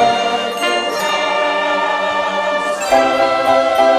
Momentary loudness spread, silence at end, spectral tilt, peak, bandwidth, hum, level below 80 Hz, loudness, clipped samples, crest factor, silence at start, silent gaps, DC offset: 4 LU; 0 s; -2.5 dB/octave; 0 dBFS; 16 kHz; none; -50 dBFS; -15 LUFS; under 0.1%; 14 dB; 0 s; none; under 0.1%